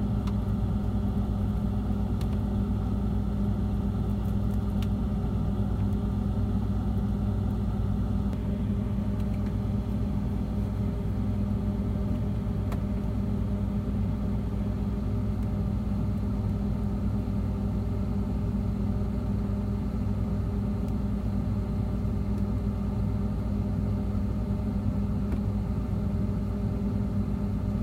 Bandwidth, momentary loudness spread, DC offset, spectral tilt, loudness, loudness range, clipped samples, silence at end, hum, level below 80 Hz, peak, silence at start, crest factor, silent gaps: 9.6 kHz; 1 LU; under 0.1%; -9.5 dB/octave; -30 LUFS; 1 LU; under 0.1%; 0 s; 50 Hz at -40 dBFS; -32 dBFS; -14 dBFS; 0 s; 14 dB; none